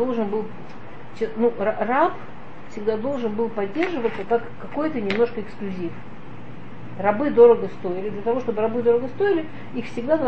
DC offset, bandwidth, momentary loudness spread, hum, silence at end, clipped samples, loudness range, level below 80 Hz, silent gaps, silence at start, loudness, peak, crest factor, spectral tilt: 3%; 7.2 kHz; 20 LU; none; 0 s; under 0.1%; 5 LU; -54 dBFS; none; 0 s; -23 LUFS; -2 dBFS; 20 dB; -7.5 dB/octave